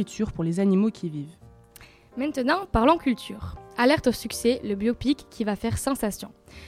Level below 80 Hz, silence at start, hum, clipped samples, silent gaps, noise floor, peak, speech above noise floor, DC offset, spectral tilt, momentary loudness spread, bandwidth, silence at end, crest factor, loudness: -44 dBFS; 0 s; none; under 0.1%; none; -51 dBFS; -6 dBFS; 26 dB; under 0.1%; -5.5 dB/octave; 16 LU; 16 kHz; 0 s; 20 dB; -25 LUFS